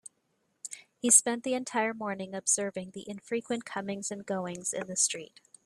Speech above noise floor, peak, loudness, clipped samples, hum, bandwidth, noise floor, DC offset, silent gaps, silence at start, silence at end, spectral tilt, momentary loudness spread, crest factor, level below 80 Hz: 45 dB; -6 dBFS; -29 LUFS; under 0.1%; none; 15.5 kHz; -76 dBFS; under 0.1%; none; 0.65 s; 0.4 s; -2 dB/octave; 20 LU; 26 dB; -76 dBFS